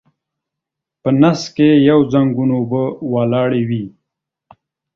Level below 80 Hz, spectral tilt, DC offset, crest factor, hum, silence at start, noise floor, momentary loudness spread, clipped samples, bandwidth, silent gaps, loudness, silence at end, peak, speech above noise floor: -54 dBFS; -7.5 dB/octave; under 0.1%; 16 dB; none; 1.05 s; -82 dBFS; 10 LU; under 0.1%; 7.4 kHz; none; -15 LUFS; 1.05 s; 0 dBFS; 69 dB